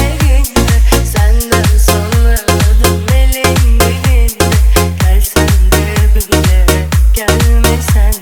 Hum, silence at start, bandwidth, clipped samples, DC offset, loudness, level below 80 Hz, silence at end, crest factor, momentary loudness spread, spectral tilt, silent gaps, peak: none; 0 s; 19.5 kHz; under 0.1%; under 0.1%; -10 LUFS; -10 dBFS; 0 s; 8 dB; 2 LU; -5 dB/octave; none; 0 dBFS